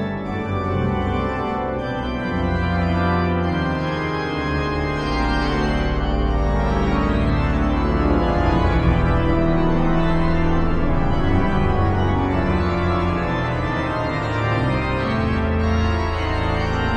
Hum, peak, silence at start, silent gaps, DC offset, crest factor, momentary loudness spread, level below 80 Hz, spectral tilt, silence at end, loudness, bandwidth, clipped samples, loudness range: none; -6 dBFS; 0 s; none; under 0.1%; 14 dB; 4 LU; -24 dBFS; -8 dB/octave; 0 s; -21 LUFS; 8.8 kHz; under 0.1%; 3 LU